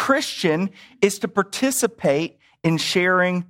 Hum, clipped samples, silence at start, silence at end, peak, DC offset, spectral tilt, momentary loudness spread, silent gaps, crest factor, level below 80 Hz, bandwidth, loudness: none; under 0.1%; 0 s; 0.05 s; -4 dBFS; under 0.1%; -4 dB/octave; 7 LU; none; 18 dB; -64 dBFS; 16.5 kHz; -21 LUFS